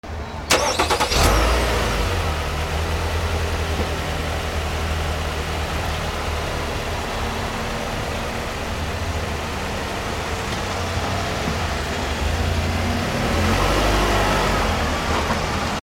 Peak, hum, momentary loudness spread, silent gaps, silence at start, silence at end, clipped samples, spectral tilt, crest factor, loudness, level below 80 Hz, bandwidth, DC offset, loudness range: 0 dBFS; none; 7 LU; none; 0.05 s; 0 s; under 0.1%; -4 dB/octave; 20 dB; -22 LUFS; -28 dBFS; 17 kHz; under 0.1%; 5 LU